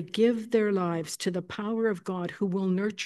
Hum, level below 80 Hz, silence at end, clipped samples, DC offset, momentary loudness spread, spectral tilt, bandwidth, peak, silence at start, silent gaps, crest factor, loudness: none; -74 dBFS; 0 s; under 0.1%; under 0.1%; 7 LU; -5.5 dB/octave; 12.5 kHz; -12 dBFS; 0 s; none; 16 dB; -29 LUFS